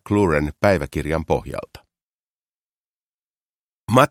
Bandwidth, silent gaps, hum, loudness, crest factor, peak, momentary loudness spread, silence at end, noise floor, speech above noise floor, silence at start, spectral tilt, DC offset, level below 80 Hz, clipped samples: 16.5 kHz; 2.02-3.35 s, 3.42-3.87 s; none; -20 LUFS; 22 dB; 0 dBFS; 14 LU; 0.05 s; under -90 dBFS; over 70 dB; 0.05 s; -6.5 dB/octave; under 0.1%; -40 dBFS; under 0.1%